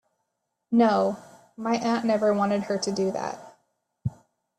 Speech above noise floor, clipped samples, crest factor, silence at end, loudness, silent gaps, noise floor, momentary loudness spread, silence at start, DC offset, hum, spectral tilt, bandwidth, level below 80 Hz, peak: 55 dB; under 0.1%; 16 dB; 0.5 s; -25 LUFS; none; -79 dBFS; 14 LU; 0.7 s; under 0.1%; none; -6 dB/octave; 10.5 kHz; -64 dBFS; -10 dBFS